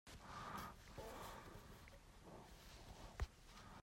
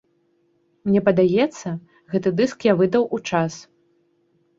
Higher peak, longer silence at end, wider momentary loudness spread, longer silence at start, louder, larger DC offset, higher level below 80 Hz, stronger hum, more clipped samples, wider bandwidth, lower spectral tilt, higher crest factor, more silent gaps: second, -34 dBFS vs -2 dBFS; second, 0 s vs 0.95 s; second, 10 LU vs 14 LU; second, 0.05 s vs 0.85 s; second, -56 LUFS vs -21 LUFS; neither; about the same, -60 dBFS vs -60 dBFS; neither; neither; first, 16 kHz vs 7.8 kHz; second, -4.5 dB/octave vs -6.5 dB/octave; about the same, 22 dB vs 20 dB; neither